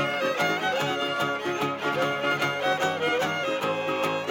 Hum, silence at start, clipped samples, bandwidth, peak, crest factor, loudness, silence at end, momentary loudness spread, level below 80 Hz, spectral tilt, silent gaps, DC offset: none; 0 s; under 0.1%; 17 kHz; -12 dBFS; 14 dB; -26 LUFS; 0 s; 2 LU; -74 dBFS; -4 dB/octave; none; under 0.1%